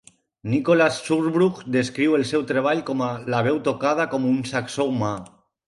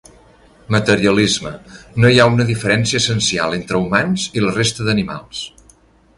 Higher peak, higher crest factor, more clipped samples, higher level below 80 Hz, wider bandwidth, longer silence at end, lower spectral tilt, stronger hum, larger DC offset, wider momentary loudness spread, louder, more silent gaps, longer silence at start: second, -6 dBFS vs 0 dBFS; about the same, 16 dB vs 16 dB; neither; second, -62 dBFS vs -44 dBFS; about the same, 11.5 kHz vs 11.5 kHz; second, 0.4 s vs 0.7 s; first, -6 dB/octave vs -4.5 dB/octave; neither; neither; second, 7 LU vs 15 LU; second, -22 LUFS vs -16 LUFS; neither; second, 0.45 s vs 0.7 s